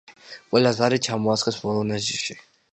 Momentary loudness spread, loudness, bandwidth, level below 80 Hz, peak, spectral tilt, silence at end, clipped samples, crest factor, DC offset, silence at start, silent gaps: 11 LU; -23 LUFS; 9.4 kHz; -60 dBFS; -4 dBFS; -4.5 dB/octave; 0.3 s; under 0.1%; 20 dB; under 0.1%; 0.1 s; none